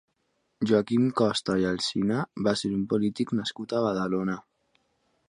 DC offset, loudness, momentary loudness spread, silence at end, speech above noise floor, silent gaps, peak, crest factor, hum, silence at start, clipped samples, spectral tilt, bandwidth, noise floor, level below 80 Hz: under 0.1%; -27 LUFS; 6 LU; 0.9 s; 48 dB; none; -8 dBFS; 18 dB; none; 0.6 s; under 0.1%; -5.5 dB/octave; 11 kHz; -74 dBFS; -60 dBFS